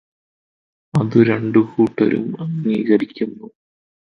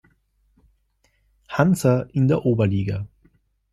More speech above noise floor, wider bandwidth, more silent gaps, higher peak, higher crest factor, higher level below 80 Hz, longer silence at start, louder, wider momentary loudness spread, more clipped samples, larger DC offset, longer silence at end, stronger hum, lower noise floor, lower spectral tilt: first, over 73 dB vs 46 dB; second, 6.8 kHz vs 14 kHz; neither; about the same, 0 dBFS vs -2 dBFS; about the same, 18 dB vs 20 dB; second, -58 dBFS vs -52 dBFS; second, 0.95 s vs 1.5 s; first, -18 LUFS vs -21 LUFS; about the same, 11 LU vs 12 LU; neither; neither; about the same, 0.6 s vs 0.65 s; neither; first, under -90 dBFS vs -66 dBFS; first, -9 dB/octave vs -7.5 dB/octave